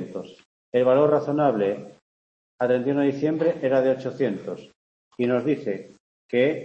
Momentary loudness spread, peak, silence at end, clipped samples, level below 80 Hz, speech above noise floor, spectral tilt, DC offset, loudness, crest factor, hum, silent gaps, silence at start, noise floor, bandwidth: 15 LU; -8 dBFS; 0 s; under 0.1%; -72 dBFS; over 68 dB; -8 dB/octave; under 0.1%; -23 LUFS; 16 dB; none; 0.45-0.72 s, 2.02-2.58 s, 4.76-5.11 s, 6.00-6.29 s; 0 s; under -90 dBFS; 7.6 kHz